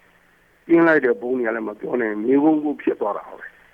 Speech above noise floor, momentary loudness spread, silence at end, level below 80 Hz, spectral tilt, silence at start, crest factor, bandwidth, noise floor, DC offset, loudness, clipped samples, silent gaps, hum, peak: 38 dB; 12 LU; 0.25 s; -66 dBFS; -8.5 dB/octave; 0.7 s; 16 dB; 4.3 kHz; -57 dBFS; under 0.1%; -20 LUFS; under 0.1%; none; none; -4 dBFS